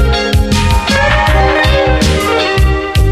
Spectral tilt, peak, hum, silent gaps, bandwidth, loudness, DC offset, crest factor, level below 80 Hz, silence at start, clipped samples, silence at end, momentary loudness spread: -5 dB/octave; 0 dBFS; none; none; 14.5 kHz; -11 LUFS; under 0.1%; 10 dB; -14 dBFS; 0 s; under 0.1%; 0 s; 3 LU